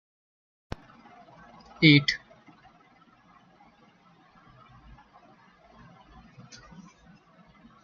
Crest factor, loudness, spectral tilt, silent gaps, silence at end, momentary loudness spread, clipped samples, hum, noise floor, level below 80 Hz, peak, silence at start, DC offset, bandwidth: 30 dB; -21 LUFS; -4 dB/octave; none; 5.65 s; 31 LU; under 0.1%; none; -59 dBFS; -60 dBFS; -4 dBFS; 1.8 s; under 0.1%; 7.2 kHz